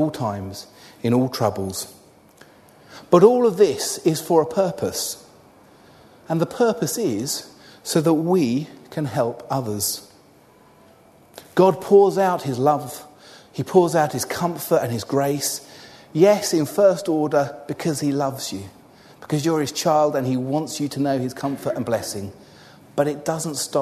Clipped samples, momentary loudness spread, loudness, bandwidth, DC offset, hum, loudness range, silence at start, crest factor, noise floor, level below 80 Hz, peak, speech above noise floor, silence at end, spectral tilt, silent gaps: under 0.1%; 14 LU; -21 LUFS; 13.5 kHz; under 0.1%; none; 5 LU; 0 s; 22 dB; -52 dBFS; -62 dBFS; 0 dBFS; 31 dB; 0 s; -5 dB/octave; none